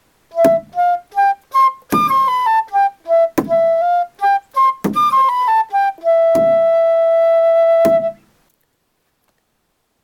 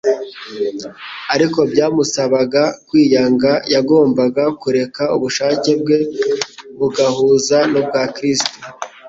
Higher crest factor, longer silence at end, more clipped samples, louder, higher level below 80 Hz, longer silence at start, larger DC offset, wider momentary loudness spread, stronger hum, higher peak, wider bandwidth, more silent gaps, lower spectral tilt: about the same, 14 dB vs 14 dB; first, 1.9 s vs 0 s; neither; about the same, -14 LUFS vs -15 LUFS; about the same, -56 dBFS vs -56 dBFS; first, 0.35 s vs 0.05 s; neither; second, 5 LU vs 10 LU; neither; about the same, 0 dBFS vs 0 dBFS; first, 17.5 kHz vs 8 kHz; neither; about the same, -5.5 dB/octave vs -4.5 dB/octave